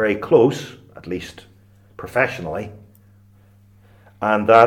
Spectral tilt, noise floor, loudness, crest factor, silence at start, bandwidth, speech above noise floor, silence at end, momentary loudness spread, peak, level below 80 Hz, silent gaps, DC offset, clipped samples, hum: -6.5 dB/octave; -51 dBFS; -20 LUFS; 20 dB; 0 s; 16 kHz; 33 dB; 0 s; 22 LU; 0 dBFS; -56 dBFS; none; under 0.1%; under 0.1%; none